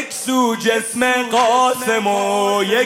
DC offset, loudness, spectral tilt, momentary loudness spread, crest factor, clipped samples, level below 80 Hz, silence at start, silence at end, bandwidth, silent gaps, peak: under 0.1%; -16 LUFS; -2.5 dB/octave; 3 LU; 14 dB; under 0.1%; -62 dBFS; 0 s; 0 s; 16.5 kHz; none; -4 dBFS